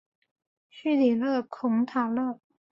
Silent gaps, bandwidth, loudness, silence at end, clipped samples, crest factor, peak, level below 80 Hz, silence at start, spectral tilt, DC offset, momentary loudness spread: none; 5.8 kHz; -27 LUFS; 0.4 s; under 0.1%; 14 dB; -14 dBFS; -74 dBFS; 0.75 s; -7.5 dB/octave; under 0.1%; 10 LU